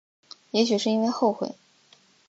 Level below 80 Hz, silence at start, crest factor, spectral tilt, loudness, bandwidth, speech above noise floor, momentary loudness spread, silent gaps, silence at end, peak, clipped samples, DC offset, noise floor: -78 dBFS; 0.55 s; 18 dB; -4.5 dB/octave; -25 LUFS; 7.8 kHz; 35 dB; 9 LU; none; 0.75 s; -8 dBFS; under 0.1%; under 0.1%; -59 dBFS